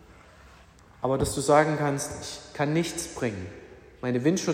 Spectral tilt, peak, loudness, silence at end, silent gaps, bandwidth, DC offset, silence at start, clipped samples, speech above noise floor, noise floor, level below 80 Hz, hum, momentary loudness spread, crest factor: -5 dB/octave; -8 dBFS; -27 LUFS; 0 s; none; 16 kHz; under 0.1%; 0.1 s; under 0.1%; 27 dB; -53 dBFS; -52 dBFS; none; 16 LU; 20 dB